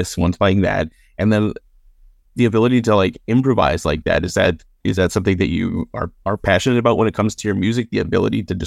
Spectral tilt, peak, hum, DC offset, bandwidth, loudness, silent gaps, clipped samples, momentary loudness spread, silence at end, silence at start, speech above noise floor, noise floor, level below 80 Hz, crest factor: -6 dB/octave; -2 dBFS; none; under 0.1%; 14.5 kHz; -18 LUFS; none; under 0.1%; 8 LU; 0 s; 0 s; 32 dB; -49 dBFS; -38 dBFS; 16 dB